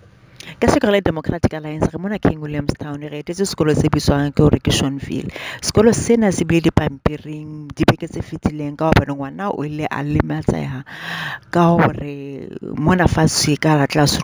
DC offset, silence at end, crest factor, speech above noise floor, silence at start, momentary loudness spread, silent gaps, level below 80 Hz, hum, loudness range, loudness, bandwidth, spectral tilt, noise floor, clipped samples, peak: under 0.1%; 0 s; 18 dB; 23 dB; 0.45 s; 14 LU; none; -34 dBFS; none; 4 LU; -18 LUFS; over 20 kHz; -5.5 dB/octave; -40 dBFS; under 0.1%; 0 dBFS